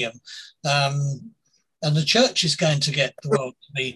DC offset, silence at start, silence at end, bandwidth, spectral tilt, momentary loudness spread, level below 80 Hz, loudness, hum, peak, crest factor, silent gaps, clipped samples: under 0.1%; 0 s; 0 s; 12.5 kHz; -4 dB/octave; 13 LU; -64 dBFS; -22 LUFS; none; -4 dBFS; 18 dB; none; under 0.1%